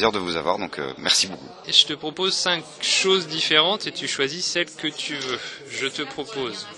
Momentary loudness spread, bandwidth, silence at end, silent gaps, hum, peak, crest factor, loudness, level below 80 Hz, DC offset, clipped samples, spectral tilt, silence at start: 12 LU; 12 kHz; 0 s; none; none; -2 dBFS; 22 dB; -22 LUFS; -60 dBFS; under 0.1%; under 0.1%; -1.5 dB/octave; 0 s